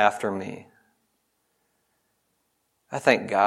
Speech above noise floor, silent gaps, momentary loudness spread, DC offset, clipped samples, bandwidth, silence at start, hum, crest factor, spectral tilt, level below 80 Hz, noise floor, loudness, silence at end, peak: 50 dB; none; 16 LU; under 0.1%; under 0.1%; 14 kHz; 0 s; none; 24 dB; -4.5 dB/octave; -78 dBFS; -73 dBFS; -25 LUFS; 0 s; -2 dBFS